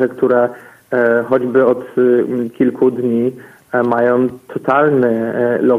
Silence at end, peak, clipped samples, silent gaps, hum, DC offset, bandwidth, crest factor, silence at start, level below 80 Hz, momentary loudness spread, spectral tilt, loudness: 0 s; 0 dBFS; under 0.1%; none; none; under 0.1%; 11 kHz; 14 dB; 0 s; -60 dBFS; 7 LU; -8.5 dB/octave; -15 LUFS